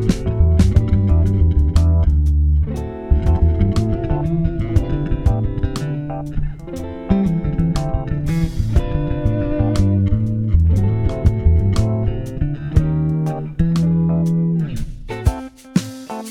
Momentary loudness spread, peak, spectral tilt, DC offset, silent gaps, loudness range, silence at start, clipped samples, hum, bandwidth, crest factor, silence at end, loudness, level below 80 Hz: 9 LU; -2 dBFS; -8.5 dB/octave; under 0.1%; none; 5 LU; 0 s; under 0.1%; none; 11 kHz; 14 dB; 0 s; -18 LUFS; -22 dBFS